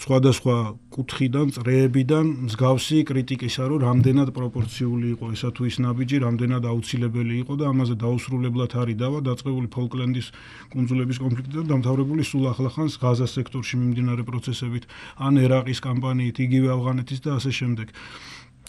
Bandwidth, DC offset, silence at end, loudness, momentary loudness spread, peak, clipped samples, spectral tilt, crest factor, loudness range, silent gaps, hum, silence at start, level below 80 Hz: 12 kHz; under 0.1%; 0.25 s; -23 LUFS; 9 LU; -6 dBFS; under 0.1%; -7 dB/octave; 18 dB; 4 LU; none; none; 0 s; -54 dBFS